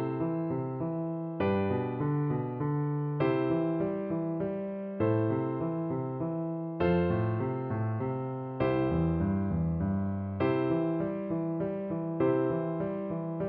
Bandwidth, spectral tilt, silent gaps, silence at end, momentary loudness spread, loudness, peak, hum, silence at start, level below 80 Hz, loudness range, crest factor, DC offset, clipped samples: 4.5 kHz; -8.5 dB/octave; none; 0 s; 6 LU; -31 LUFS; -16 dBFS; none; 0 s; -52 dBFS; 1 LU; 14 dB; under 0.1%; under 0.1%